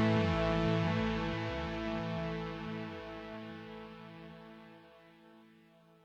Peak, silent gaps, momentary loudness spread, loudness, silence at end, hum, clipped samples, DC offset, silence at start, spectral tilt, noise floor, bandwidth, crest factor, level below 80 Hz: -18 dBFS; none; 20 LU; -36 LUFS; 0.6 s; none; under 0.1%; under 0.1%; 0 s; -7.5 dB/octave; -63 dBFS; 7.8 kHz; 18 dB; -52 dBFS